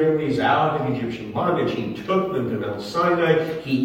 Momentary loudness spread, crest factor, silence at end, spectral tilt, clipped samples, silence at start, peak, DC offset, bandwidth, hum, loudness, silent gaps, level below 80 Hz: 8 LU; 18 dB; 0 s; -7 dB/octave; under 0.1%; 0 s; -4 dBFS; under 0.1%; 16.5 kHz; none; -22 LUFS; none; -56 dBFS